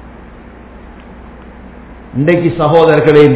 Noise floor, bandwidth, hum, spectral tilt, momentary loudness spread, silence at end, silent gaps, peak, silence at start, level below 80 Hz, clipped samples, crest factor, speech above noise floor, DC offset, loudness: -34 dBFS; 4 kHz; none; -11.5 dB/octave; 8 LU; 0 s; none; 0 dBFS; 0.05 s; -36 dBFS; 1%; 12 dB; 26 dB; under 0.1%; -10 LUFS